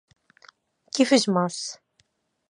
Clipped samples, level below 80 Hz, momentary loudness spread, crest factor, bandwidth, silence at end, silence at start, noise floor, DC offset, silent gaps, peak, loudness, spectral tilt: under 0.1%; -80 dBFS; 15 LU; 22 dB; 11 kHz; 0.75 s; 0.95 s; -69 dBFS; under 0.1%; none; -6 dBFS; -23 LUFS; -4 dB/octave